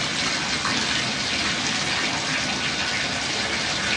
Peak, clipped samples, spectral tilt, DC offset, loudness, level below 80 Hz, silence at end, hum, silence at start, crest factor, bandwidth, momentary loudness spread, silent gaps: -8 dBFS; under 0.1%; -1.5 dB/octave; under 0.1%; -22 LUFS; -50 dBFS; 0 s; none; 0 s; 16 dB; 11.5 kHz; 1 LU; none